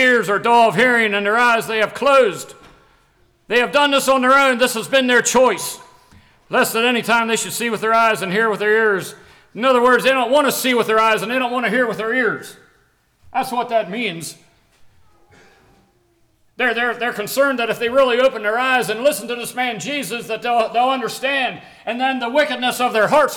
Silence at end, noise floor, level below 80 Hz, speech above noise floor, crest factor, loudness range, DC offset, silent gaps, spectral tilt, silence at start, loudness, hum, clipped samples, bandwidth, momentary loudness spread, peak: 0 s; -59 dBFS; -60 dBFS; 42 dB; 12 dB; 9 LU; under 0.1%; none; -3 dB/octave; 0 s; -17 LUFS; none; under 0.1%; over 20 kHz; 10 LU; -6 dBFS